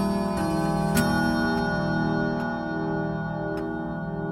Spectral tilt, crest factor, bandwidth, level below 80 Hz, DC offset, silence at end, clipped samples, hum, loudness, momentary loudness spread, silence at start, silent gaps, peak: -6 dB/octave; 18 dB; 16.5 kHz; -44 dBFS; under 0.1%; 0 s; under 0.1%; 60 Hz at -50 dBFS; -26 LUFS; 7 LU; 0 s; none; -8 dBFS